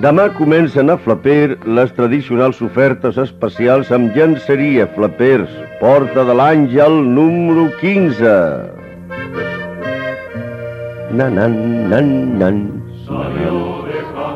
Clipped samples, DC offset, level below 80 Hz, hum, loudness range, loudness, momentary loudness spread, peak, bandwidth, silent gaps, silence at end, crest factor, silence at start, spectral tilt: under 0.1%; under 0.1%; -46 dBFS; none; 6 LU; -13 LUFS; 14 LU; 0 dBFS; 7.2 kHz; none; 0 s; 12 dB; 0 s; -9 dB/octave